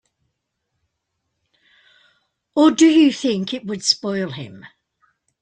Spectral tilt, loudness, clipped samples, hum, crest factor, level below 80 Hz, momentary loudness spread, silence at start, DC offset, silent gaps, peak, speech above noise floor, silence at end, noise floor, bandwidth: -4 dB/octave; -17 LUFS; under 0.1%; none; 20 dB; -66 dBFS; 15 LU; 2.55 s; under 0.1%; none; -2 dBFS; 59 dB; 0.75 s; -76 dBFS; 9.4 kHz